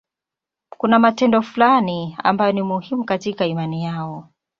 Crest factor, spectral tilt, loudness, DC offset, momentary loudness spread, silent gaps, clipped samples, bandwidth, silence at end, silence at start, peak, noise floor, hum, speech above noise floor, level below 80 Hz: 18 dB; -7 dB/octave; -19 LUFS; under 0.1%; 11 LU; none; under 0.1%; 7.2 kHz; 0.4 s; 0.85 s; -2 dBFS; -87 dBFS; none; 69 dB; -62 dBFS